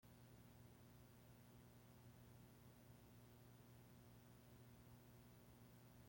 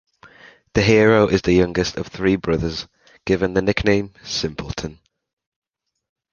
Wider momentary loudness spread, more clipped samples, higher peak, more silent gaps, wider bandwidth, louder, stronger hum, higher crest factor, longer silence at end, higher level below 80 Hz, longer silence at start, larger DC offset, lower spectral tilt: second, 1 LU vs 15 LU; neither; second, -54 dBFS vs -2 dBFS; neither; first, 16.5 kHz vs 7.2 kHz; second, -67 LUFS vs -19 LUFS; first, 60 Hz at -70 dBFS vs none; second, 12 dB vs 18 dB; second, 0 s vs 1.4 s; second, -78 dBFS vs -40 dBFS; second, 0 s vs 0.25 s; neither; about the same, -5.5 dB/octave vs -5.5 dB/octave